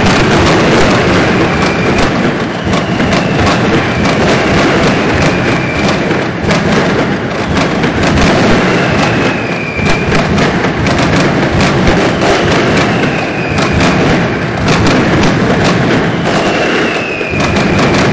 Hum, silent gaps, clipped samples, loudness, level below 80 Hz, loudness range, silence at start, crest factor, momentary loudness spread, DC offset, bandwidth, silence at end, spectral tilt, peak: none; none; under 0.1%; -10 LUFS; -26 dBFS; 1 LU; 0 s; 10 dB; 4 LU; under 0.1%; 8 kHz; 0 s; -5.5 dB/octave; 0 dBFS